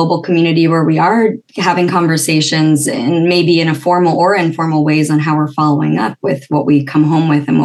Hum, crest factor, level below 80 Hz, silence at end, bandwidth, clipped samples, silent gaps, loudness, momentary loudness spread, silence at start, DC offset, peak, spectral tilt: none; 12 dB; -64 dBFS; 0 s; 12.5 kHz; under 0.1%; none; -12 LUFS; 4 LU; 0 s; under 0.1%; 0 dBFS; -5.5 dB/octave